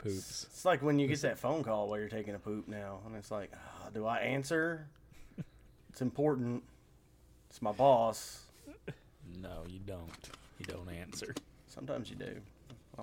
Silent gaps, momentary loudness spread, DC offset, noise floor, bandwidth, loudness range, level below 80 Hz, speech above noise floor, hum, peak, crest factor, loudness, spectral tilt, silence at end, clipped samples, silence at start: none; 21 LU; under 0.1%; -64 dBFS; 16.5 kHz; 11 LU; -62 dBFS; 27 dB; none; -16 dBFS; 22 dB; -36 LUFS; -5.5 dB/octave; 0 s; under 0.1%; 0 s